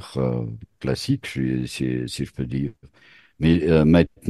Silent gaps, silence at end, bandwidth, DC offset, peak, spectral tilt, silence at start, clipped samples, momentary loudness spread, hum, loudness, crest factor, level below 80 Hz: none; 0 s; 12.5 kHz; under 0.1%; -2 dBFS; -7 dB/octave; 0 s; under 0.1%; 12 LU; none; -23 LUFS; 22 dB; -40 dBFS